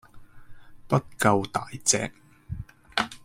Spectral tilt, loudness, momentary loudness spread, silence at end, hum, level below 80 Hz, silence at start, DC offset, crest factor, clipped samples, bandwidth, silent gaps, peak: -3.5 dB/octave; -26 LUFS; 17 LU; 0.05 s; none; -52 dBFS; 0.15 s; under 0.1%; 24 dB; under 0.1%; 16.5 kHz; none; -4 dBFS